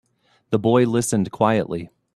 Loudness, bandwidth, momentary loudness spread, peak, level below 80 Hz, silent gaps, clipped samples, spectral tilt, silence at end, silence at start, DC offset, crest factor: -20 LUFS; 14 kHz; 10 LU; -2 dBFS; -56 dBFS; none; under 0.1%; -6 dB/octave; 0.3 s; 0.5 s; under 0.1%; 18 dB